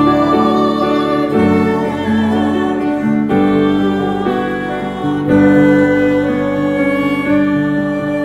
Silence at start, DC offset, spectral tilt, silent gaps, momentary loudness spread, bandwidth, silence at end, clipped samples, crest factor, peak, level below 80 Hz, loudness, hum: 0 s; under 0.1%; -7.5 dB/octave; none; 6 LU; 11.5 kHz; 0 s; under 0.1%; 12 dB; 0 dBFS; -42 dBFS; -14 LUFS; none